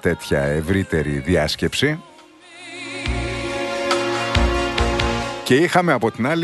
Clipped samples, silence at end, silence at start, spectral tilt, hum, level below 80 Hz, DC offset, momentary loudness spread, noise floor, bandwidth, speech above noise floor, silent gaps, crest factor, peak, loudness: under 0.1%; 0 s; 0.05 s; -5 dB/octave; none; -30 dBFS; under 0.1%; 9 LU; -45 dBFS; 12 kHz; 26 dB; none; 18 dB; -2 dBFS; -20 LUFS